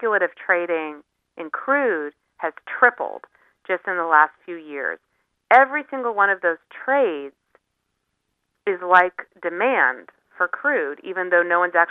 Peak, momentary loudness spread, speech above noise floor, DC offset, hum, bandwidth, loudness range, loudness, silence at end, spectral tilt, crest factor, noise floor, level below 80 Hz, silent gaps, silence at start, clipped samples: 0 dBFS; 15 LU; 55 dB; under 0.1%; none; 4.5 kHz; 3 LU; -20 LUFS; 0 s; -6 dB/octave; 20 dB; -76 dBFS; -76 dBFS; none; 0 s; under 0.1%